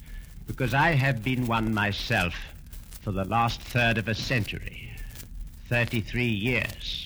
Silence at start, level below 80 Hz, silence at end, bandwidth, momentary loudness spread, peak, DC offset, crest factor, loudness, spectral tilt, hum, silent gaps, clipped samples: 0 s; -42 dBFS; 0 s; over 20 kHz; 19 LU; -10 dBFS; under 0.1%; 16 dB; -26 LUFS; -5.5 dB/octave; none; none; under 0.1%